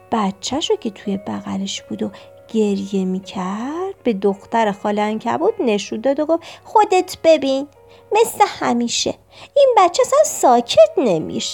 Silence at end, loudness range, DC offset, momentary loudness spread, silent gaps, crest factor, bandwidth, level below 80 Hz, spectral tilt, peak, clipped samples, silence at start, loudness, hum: 0 s; 7 LU; under 0.1%; 11 LU; none; 16 dB; 17 kHz; -58 dBFS; -4 dB/octave; -2 dBFS; under 0.1%; 0.1 s; -18 LUFS; none